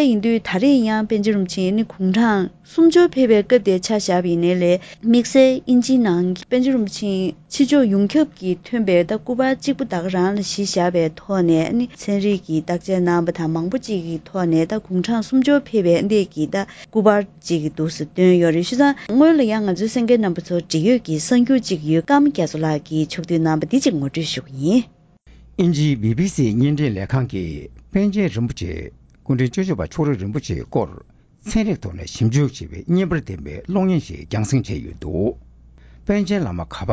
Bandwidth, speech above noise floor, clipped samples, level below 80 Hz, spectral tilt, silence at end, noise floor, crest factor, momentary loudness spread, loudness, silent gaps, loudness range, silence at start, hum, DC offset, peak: 8 kHz; 30 dB; under 0.1%; -42 dBFS; -6.5 dB/octave; 0 s; -48 dBFS; 18 dB; 10 LU; -19 LUFS; none; 6 LU; 0 s; none; under 0.1%; 0 dBFS